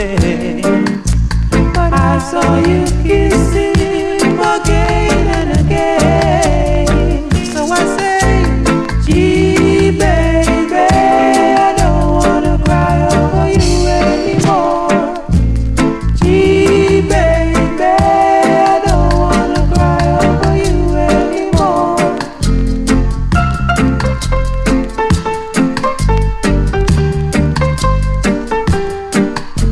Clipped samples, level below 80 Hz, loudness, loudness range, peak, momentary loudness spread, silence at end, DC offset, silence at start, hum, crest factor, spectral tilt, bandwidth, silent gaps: under 0.1%; -18 dBFS; -12 LUFS; 4 LU; 0 dBFS; 5 LU; 0 s; under 0.1%; 0 s; none; 10 dB; -6 dB/octave; 13 kHz; none